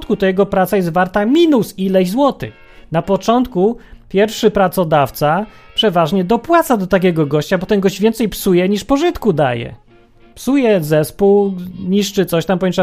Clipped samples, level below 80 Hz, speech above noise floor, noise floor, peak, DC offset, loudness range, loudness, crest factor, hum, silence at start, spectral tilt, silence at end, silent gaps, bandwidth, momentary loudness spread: under 0.1%; -40 dBFS; 31 dB; -45 dBFS; 0 dBFS; under 0.1%; 2 LU; -15 LUFS; 14 dB; none; 0 s; -6 dB/octave; 0 s; none; 15.5 kHz; 7 LU